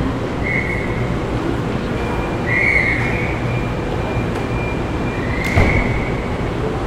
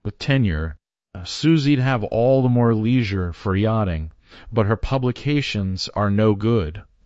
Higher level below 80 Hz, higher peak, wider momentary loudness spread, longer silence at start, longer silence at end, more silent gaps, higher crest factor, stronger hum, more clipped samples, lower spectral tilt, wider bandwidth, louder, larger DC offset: first, -26 dBFS vs -40 dBFS; first, 0 dBFS vs -4 dBFS; second, 7 LU vs 10 LU; about the same, 0 s vs 0.05 s; second, 0 s vs 0.2 s; neither; about the same, 18 dB vs 16 dB; neither; neither; about the same, -7 dB/octave vs -7 dB/octave; first, 15 kHz vs 8 kHz; about the same, -19 LUFS vs -20 LUFS; neither